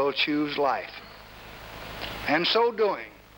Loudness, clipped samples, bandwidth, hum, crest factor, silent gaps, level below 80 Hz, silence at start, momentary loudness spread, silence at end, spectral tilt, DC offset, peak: -26 LUFS; under 0.1%; 18.5 kHz; none; 16 dB; none; -54 dBFS; 0 s; 20 LU; 0.2 s; -5 dB/octave; under 0.1%; -12 dBFS